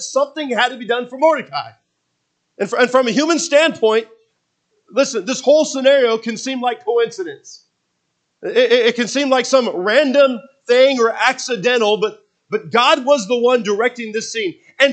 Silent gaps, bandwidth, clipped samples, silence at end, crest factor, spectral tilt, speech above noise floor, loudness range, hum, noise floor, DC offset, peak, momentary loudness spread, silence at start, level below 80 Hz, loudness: none; 9 kHz; under 0.1%; 0 s; 16 dB; -2.5 dB/octave; 55 dB; 3 LU; none; -71 dBFS; under 0.1%; 0 dBFS; 11 LU; 0 s; -78 dBFS; -16 LUFS